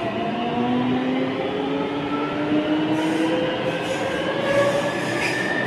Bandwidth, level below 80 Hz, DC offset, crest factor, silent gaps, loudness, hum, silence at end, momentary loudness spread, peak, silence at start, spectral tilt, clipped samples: 13 kHz; -54 dBFS; under 0.1%; 14 dB; none; -22 LUFS; none; 0 s; 4 LU; -8 dBFS; 0 s; -5.5 dB/octave; under 0.1%